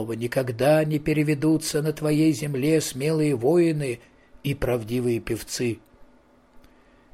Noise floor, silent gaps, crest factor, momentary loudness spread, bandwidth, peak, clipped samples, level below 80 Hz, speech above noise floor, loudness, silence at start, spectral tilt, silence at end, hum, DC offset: -57 dBFS; none; 16 dB; 9 LU; 16 kHz; -8 dBFS; under 0.1%; -48 dBFS; 34 dB; -24 LUFS; 0 s; -6 dB/octave; 1.1 s; none; under 0.1%